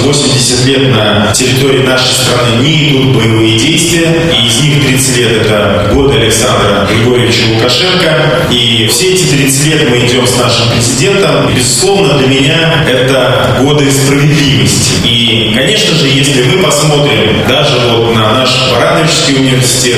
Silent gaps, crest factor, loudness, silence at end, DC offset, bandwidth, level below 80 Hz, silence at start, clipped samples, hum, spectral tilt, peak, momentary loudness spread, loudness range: none; 6 dB; -7 LUFS; 0 s; under 0.1%; 16 kHz; -30 dBFS; 0 s; under 0.1%; none; -4 dB/octave; 0 dBFS; 1 LU; 0 LU